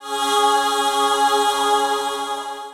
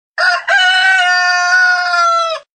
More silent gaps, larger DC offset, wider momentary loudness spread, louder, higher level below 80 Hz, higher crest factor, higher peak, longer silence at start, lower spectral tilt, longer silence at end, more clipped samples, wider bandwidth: neither; neither; first, 8 LU vs 4 LU; second, -19 LUFS vs -10 LUFS; first, -62 dBFS vs -72 dBFS; about the same, 14 dB vs 10 dB; second, -6 dBFS vs -2 dBFS; second, 0 s vs 0.15 s; first, 0.5 dB/octave vs 4 dB/octave; second, 0 s vs 0.15 s; neither; first, 18.5 kHz vs 9.4 kHz